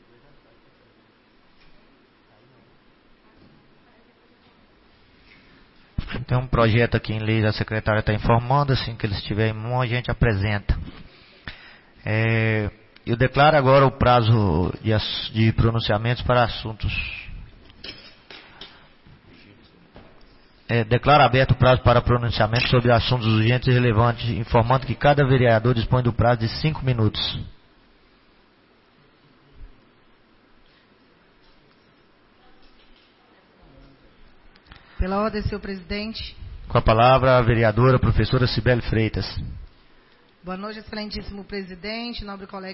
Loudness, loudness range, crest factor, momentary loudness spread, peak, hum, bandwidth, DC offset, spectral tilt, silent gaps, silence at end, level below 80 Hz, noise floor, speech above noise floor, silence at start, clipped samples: -21 LUFS; 13 LU; 16 dB; 19 LU; -6 dBFS; none; 5.8 kHz; under 0.1%; -10.5 dB/octave; none; 0 s; -36 dBFS; -57 dBFS; 38 dB; 6 s; under 0.1%